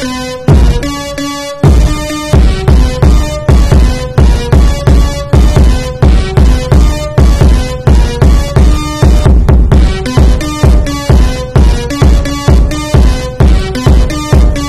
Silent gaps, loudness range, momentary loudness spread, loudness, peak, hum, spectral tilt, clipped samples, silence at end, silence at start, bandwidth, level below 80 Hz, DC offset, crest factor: none; 1 LU; 4 LU; -9 LUFS; 0 dBFS; none; -6.5 dB/octave; 0.2%; 0 s; 0 s; 13 kHz; -8 dBFS; 2%; 6 dB